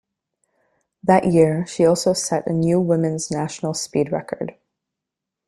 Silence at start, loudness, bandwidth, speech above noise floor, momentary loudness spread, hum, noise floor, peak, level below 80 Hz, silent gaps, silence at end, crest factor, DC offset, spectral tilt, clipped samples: 1.05 s; -20 LUFS; 13 kHz; 65 dB; 10 LU; none; -84 dBFS; -2 dBFS; -56 dBFS; none; 0.95 s; 18 dB; under 0.1%; -5.5 dB/octave; under 0.1%